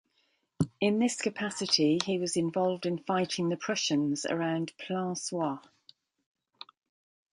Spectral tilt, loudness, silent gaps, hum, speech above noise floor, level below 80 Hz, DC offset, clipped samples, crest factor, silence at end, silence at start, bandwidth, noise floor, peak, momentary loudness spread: -4.5 dB/octave; -30 LUFS; none; none; 44 dB; -68 dBFS; under 0.1%; under 0.1%; 22 dB; 1.75 s; 0.6 s; 11.5 kHz; -74 dBFS; -10 dBFS; 8 LU